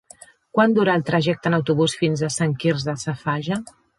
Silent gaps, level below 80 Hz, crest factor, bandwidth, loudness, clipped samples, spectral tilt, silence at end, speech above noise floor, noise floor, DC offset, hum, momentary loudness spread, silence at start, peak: none; -58 dBFS; 18 dB; 11.5 kHz; -21 LUFS; under 0.1%; -5.5 dB/octave; 0.35 s; 28 dB; -48 dBFS; under 0.1%; none; 8 LU; 0.55 s; -4 dBFS